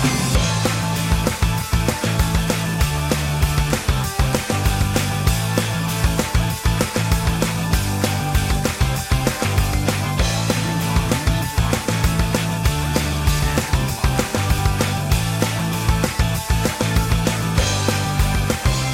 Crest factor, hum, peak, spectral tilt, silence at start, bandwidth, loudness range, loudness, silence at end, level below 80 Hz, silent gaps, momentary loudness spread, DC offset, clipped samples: 16 dB; none; -4 dBFS; -4.5 dB/octave; 0 s; 16.5 kHz; 0 LU; -20 LUFS; 0 s; -24 dBFS; none; 2 LU; under 0.1%; under 0.1%